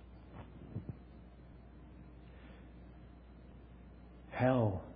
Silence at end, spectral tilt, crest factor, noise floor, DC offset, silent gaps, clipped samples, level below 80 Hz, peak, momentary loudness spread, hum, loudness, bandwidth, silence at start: 0 s; -7.5 dB/octave; 24 dB; -55 dBFS; under 0.1%; none; under 0.1%; -58 dBFS; -18 dBFS; 24 LU; none; -36 LUFS; 4.8 kHz; 0.05 s